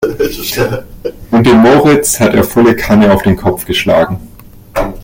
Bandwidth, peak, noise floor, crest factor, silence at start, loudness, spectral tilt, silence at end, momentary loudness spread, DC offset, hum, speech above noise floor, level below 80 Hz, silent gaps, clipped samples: 17 kHz; 0 dBFS; -34 dBFS; 10 dB; 0 s; -10 LUFS; -5 dB/octave; 0 s; 14 LU; under 0.1%; none; 25 dB; -30 dBFS; none; under 0.1%